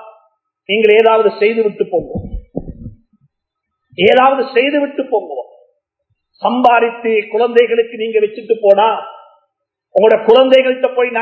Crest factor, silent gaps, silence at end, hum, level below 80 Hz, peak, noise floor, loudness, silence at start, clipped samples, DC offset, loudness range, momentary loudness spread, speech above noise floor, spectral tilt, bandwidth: 14 dB; none; 0 s; none; -42 dBFS; 0 dBFS; -76 dBFS; -12 LUFS; 0.05 s; 0.2%; under 0.1%; 3 LU; 18 LU; 64 dB; -6.5 dB/octave; 5.2 kHz